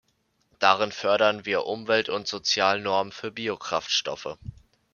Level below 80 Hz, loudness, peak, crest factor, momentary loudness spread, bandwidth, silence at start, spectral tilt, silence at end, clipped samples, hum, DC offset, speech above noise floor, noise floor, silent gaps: -60 dBFS; -25 LUFS; -2 dBFS; 24 dB; 12 LU; 7.2 kHz; 0.6 s; -2.5 dB/octave; 0.45 s; under 0.1%; none; under 0.1%; 45 dB; -70 dBFS; none